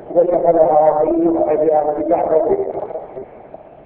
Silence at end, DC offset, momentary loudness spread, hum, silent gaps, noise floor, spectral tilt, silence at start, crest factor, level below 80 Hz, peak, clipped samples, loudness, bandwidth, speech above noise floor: 0.4 s; under 0.1%; 17 LU; none; none; -38 dBFS; -12 dB/octave; 0 s; 16 dB; -50 dBFS; 0 dBFS; under 0.1%; -15 LUFS; 3 kHz; 24 dB